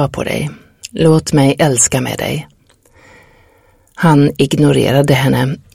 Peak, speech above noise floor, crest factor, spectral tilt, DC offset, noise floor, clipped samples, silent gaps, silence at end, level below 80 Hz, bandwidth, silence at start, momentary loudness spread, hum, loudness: 0 dBFS; 38 dB; 14 dB; -5 dB/octave; under 0.1%; -50 dBFS; under 0.1%; none; 0.15 s; -42 dBFS; 16 kHz; 0 s; 10 LU; none; -13 LUFS